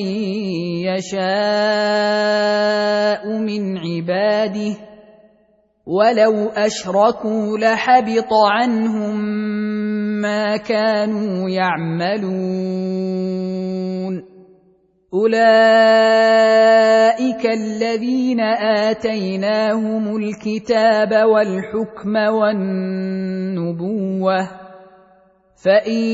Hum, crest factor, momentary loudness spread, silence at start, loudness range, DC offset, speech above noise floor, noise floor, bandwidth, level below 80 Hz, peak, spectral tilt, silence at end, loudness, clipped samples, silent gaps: none; 16 dB; 11 LU; 0 s; 8 LU; under 0.1%; 41 dB; -58 dBFS; 8 kHz; -62 dBFS; -2 dBFS; -6 dB/octave; 0 s; -17 LUFS; under 0.1%; none